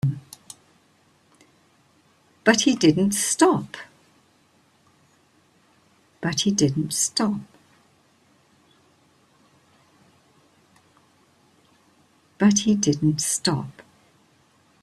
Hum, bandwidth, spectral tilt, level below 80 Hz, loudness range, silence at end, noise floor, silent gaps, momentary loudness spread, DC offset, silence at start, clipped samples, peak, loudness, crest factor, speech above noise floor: none; 14 kHz; -4 dB/octave; -62 dBFS; 6 LU; 1 s; -61 dBFS; none; 21 LU; under 0.1%; 0.05 s; under 0.1%; -2 dBFS; -21 LUFS; 24 dB; 40 dB